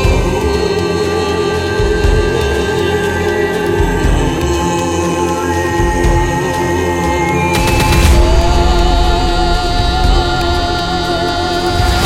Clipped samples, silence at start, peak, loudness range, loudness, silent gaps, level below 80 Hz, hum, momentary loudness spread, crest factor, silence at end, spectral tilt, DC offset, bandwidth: under 0.1%; 0 s; 0 dBFS; 2 LU; -13 LUFS; none; -16 dBFS; none; 3 LU; 12 dB; 0 s; -5 dB/octave; under 0.1%; 16.5 kHz